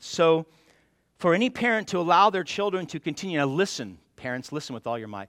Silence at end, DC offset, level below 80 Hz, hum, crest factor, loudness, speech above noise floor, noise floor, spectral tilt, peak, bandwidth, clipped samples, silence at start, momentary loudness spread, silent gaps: 0.05 s; under 0.1%; -68 dBFS; none; 18 dB; -25 LUFS; 39 dB; -64 dBFS; -5 dB/octave; -8 dBFS; 14.5 kHz; under 0.1%; 0 s; 14 LU; none